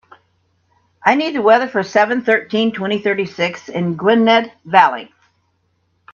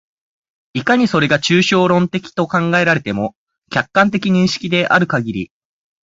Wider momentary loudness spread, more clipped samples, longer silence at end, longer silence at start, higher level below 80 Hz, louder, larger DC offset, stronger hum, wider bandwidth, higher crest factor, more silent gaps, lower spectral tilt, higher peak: about the same, 8 LU vs 10 LU; neither; first, 1.1 s vs 0.6 s; first, 1.05 s vs 0.75 s; second, -64 dBFS vs -52 dBFS; about the same, -15 LUFS vs -15 LUFS; neither; neither; about the same, 7.2 kHz vs 7.8 kHz; about the same, 16 dB vs 16 dB; second, none vs 3.36-3.47 s, 3.58-3.62 s; about the same, -5.5 dB/octave vs -5.5 dB/octave; about the same, 0 dBFS vs 0 dBFS